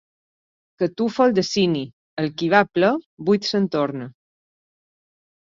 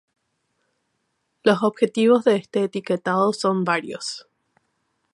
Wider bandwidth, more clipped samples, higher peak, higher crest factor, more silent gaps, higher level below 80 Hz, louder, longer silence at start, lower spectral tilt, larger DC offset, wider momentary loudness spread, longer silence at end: second, 7.6 kHz vs 11.5 kHz; neither; about the same, -2 dBFS vs -4 dBFS; about the same, 22 dB vs 20 dB; first, 1.93-2.17 s, 3.06-3.17 s vs none; first, -64 dBFS vs -74 dBFS; about the same, -21 LUFS vs -21 LUFS; second, 0.8 s vs 1.45 s; about the same, -5.5 dB/octave vs -5.5 dB/octave; neither; second, 9 LU vs 13 LU; first, 1.35 s vs 0.95 s